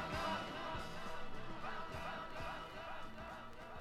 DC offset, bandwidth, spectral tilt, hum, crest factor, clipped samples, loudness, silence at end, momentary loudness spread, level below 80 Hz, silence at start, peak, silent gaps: under 0.1%; 14 kHz; -4.5 dB/octave; none; 16 dB; under 0.1%; -46 LUFS; 0 s; 9 LU; -56 dBFS; 0 s; -28 dBFS; none